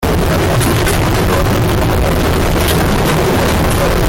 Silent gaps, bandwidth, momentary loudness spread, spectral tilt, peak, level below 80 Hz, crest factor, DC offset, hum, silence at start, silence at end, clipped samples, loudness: none; 17 kHz; 1 LU; -5 dB/octave; -4 dBFS; -20 dBFS; 8 dB; under 0.1%; none; 0 s; 0 s; under 0.1%; -13 LUFS